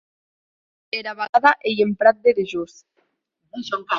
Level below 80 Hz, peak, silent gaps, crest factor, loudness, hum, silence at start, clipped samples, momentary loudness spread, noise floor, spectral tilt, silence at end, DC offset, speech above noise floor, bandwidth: -68 dBFS; -2 dBFS; 1.29-1.33 s; 20 dB; -20 LUFS; none; 0.95 s; under 0.1%; 16 LU; -72 dBFS; -5 dB/octave; 0 s; under 0.1%; 52 dB; 7.4 kHz